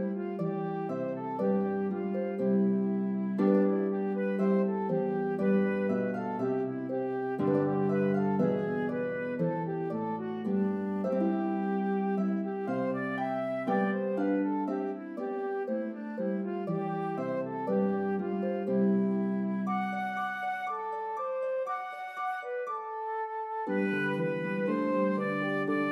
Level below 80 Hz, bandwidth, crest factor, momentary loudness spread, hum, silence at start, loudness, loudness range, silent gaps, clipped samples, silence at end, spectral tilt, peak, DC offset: -80 dBFS; 5.4 kHz; 16 dB; 7 LU; none; 0 s; -31 LUFS; 5 LU; none; under 0.1%; 0 s; -9.5 dB/octave; -14 dBFS; under 0.1%